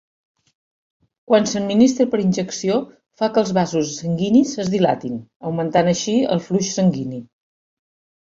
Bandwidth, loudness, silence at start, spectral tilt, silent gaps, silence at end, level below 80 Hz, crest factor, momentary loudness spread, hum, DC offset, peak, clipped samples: 7.8 kHz; -19 LUFS; 1.3 s; -5.5 dB/octave; 5.36-5.40 s; 1 s; -58 dBFS; 18 dB; 11 LU; none; under 0.1%; -2 dBFS; under 0.1%